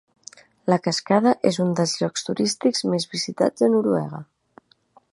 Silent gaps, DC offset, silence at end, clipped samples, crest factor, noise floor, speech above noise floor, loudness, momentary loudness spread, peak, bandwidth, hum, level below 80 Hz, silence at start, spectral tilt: none; under 0.1%; 0.9 s; under 0.1%; 20 dB; -58 dBFS; 37 dB; -22 LUFS; 7 LU; -2 dBFS; 11.5 kHz; none; -68 dBFS; 0.65 s; -5 dB/octave